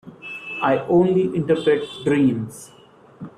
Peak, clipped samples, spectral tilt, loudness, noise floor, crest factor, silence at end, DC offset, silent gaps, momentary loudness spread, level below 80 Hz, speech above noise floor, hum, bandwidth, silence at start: -6 dBFS; under 0.1%; -7 dB/octave; -20 LUFS; -47 dBFS; 16 dB; 0.1 s; under 0.1%; none; 17 LU; -58 dBFS; 28 dB; none; 13.5 kHz; 0.05 s